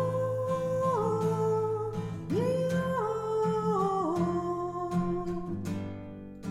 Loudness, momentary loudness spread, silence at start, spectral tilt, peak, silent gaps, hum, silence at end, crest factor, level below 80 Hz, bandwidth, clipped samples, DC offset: -30 LUFS; 8 LU; 0 s; -8 dB/octave; -16 dBFS; none; none; 0 s; 14 dB; -56 dBFS; 13.5 kHz; under 0.1%; under 0.1%